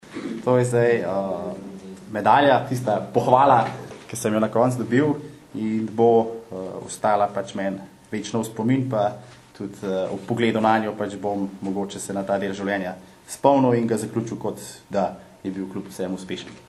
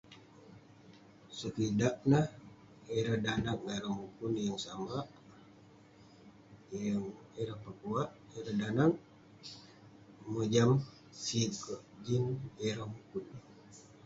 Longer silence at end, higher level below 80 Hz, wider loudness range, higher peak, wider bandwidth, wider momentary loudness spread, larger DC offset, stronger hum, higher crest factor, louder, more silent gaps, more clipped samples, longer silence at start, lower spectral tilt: second, 0.05 s vs 0.25 s; about the same, -62 dBFS vs -64 dBFS; about the same, 5 LU vs 7 LU; first, 0 dBFS vs -14 dBFS; first, 13 kHz vs 8 kHz; second, 15 LU vs 22 LU; neither; neither; about the same, 22 dB vs 22 dB; first, -23 LUFS vs -36 LUFS; neither; neither; about the same, 0.05 s vs 0.1 s; about the same, -6 dB/octave vs -6 dB/octave